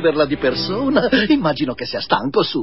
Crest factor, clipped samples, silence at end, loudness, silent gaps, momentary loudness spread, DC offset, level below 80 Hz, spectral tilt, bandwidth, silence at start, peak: 18 dB; under 0.1%; 0 s; -18 LUFS; none; 7 LU; 0.7%; -44 dBFS; -9 dB/octave; 5.8 kHz; 0 s; 0 dBFS